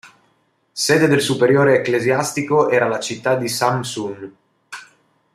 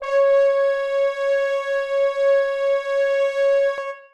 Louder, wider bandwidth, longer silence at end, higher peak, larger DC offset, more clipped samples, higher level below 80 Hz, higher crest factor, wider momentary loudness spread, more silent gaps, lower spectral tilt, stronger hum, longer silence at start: first, -17 LUFS vs -20 LUFS; first, 15.5 kHz vs 8.2 kHz; first, 0.5 s vs 0.1 s; first, -2 dBFS vs -10 dBFS; neither; neither; about the same, -60 dBFS vs -60 dBFS; first, 16 dB vs 10 dB; first, 22 LU vs 5 LU; neither; first, -4.5 dB/octave vs 0.5 dB/octave; neither; about the same, 0.05 s vs 0 s